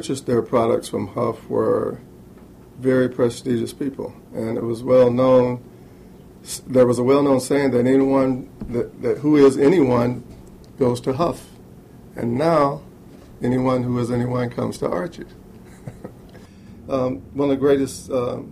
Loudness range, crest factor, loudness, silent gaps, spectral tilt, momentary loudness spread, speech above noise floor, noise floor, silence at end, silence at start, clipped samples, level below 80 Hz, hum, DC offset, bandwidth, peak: 7 LU; 16 dB; -20 LUFS; none; -7 dB/octave; 17 LU; 25 dB; -44 dBFS; 0 s; 0 s; under 0.1%; -50 dBFS; none; under 0.1%; 14.5 kHz; -4 dBFS